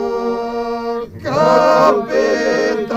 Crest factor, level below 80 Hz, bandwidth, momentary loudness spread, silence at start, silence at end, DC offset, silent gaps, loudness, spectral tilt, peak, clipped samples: 14 dB; -48 dBFS; 15 kHz; 11 LU; 0 s; 0 s; under 0.1%; none; -15 LUFS; -5 dB/octave; 0 dBFS; under 0.1%